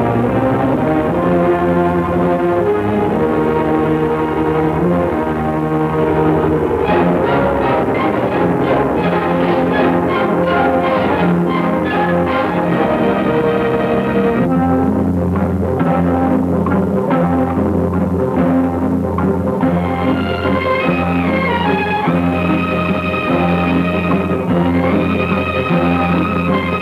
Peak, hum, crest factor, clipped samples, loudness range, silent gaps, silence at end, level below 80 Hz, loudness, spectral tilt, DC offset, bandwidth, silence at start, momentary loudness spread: -2 dBFS; none; 12 dB; under 0.1%; 1 LU; none; 0 s; -36 dBFS; -15 LUFS; -8.5 dB/octave; under 0.1%; 13 kHz; 0 s; 2 LU